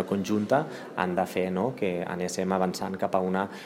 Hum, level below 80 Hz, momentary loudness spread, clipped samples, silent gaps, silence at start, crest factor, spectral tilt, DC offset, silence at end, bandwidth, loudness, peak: none; -68 dBFS; 5 LU; under 0.1%; none; 0 s; 20 dB; -6 dB/octave; under 0.1%; 0 s; 16 kHz; -28 LUFS; -8 dBFS